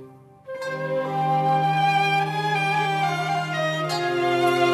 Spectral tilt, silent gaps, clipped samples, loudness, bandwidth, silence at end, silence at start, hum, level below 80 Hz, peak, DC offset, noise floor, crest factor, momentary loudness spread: -5.5 dB/octave; none; under 0.1%; -22 LUFS; 14 kHz; 0 s; 0 s; none; -68 dBFS; -8 dBFS; under 0.1%; -44 dBFS; 16 dB; 7 LU